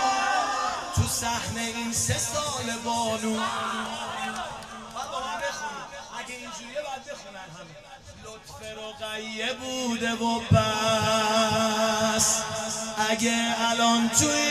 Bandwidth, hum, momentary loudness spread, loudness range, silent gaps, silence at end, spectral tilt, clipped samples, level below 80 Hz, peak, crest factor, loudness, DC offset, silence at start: 14 kHz; none; 18 LU; 12 LU; none; 0 s; -3 dB/octave; under 0.1%; -52 dBFS; -6 dBFS; 22 dB; -26 LUFS; under 0.1%; 0 s